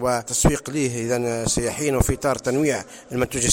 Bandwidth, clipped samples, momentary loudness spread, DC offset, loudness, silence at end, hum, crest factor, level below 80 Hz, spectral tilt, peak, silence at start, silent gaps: 17 kHz; under 0.1%; 5 LU; under 0.1%; -22 LUFS; 0 s; none; 20 dB; -34 dBFS; -4 dB/octave; -2 dBFS; 0 s; none